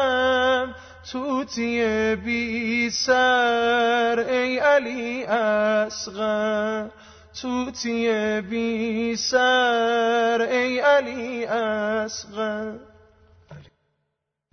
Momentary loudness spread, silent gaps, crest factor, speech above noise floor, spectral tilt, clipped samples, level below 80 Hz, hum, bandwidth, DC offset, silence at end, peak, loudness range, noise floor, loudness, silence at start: 11 LU; none; 16 dB; 56 dB; -3.5 dB/octave; under 0.1%; -56 dBFS; none; 6.6 kHz; under 0.1%; 0.9 s; -8 dBFS; 5 LU; -78 dBFS; -22 LUFS; 0 s